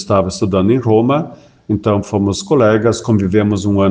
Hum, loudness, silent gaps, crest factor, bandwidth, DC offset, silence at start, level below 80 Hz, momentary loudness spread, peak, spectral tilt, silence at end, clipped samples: none; -14 LUFS; none; 14 dB; 9.6 kHz; under 0.1%; 0 s; -46 dBFS; 5 LU; 0 dBFS; -7 dB/octave; 0 s; under 0.1%